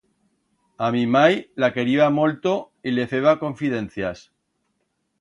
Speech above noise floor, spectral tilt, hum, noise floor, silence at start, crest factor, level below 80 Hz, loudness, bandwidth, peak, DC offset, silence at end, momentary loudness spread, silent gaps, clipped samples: 52 dB; -6.5 dB/octave; none; -73 dBFS; 0.8 s; 20 dB; -60 dBFS; -21 LUFS; 10 kHz; -2 dBFS; under 0.1%; 1 s; 10 LU; none; under 0.1%